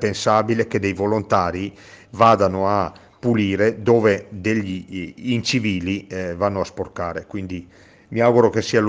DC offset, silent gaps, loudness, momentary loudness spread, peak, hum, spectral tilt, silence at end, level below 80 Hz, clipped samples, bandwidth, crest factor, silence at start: under 0.1%; none; -20 LUFS; 14 LU; -2 dBFS; none; -6 dB/octave; 0 s; -52 dBFS; under 0.1%; 9.6 kHz; 18 dB; 0 s